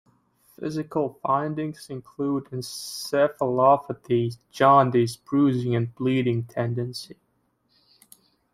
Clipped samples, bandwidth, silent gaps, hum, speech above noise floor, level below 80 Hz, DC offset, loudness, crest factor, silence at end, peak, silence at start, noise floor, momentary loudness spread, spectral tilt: under 0.1%; 16 kHz; none; none; 46 dB; -66 dBFS; under 0.1%; -24 LUFS; 20 dB; 1.4 s; -4 dBFS; 0.6 s; -69 dBFS; 14 LU; -6.5 dB/octave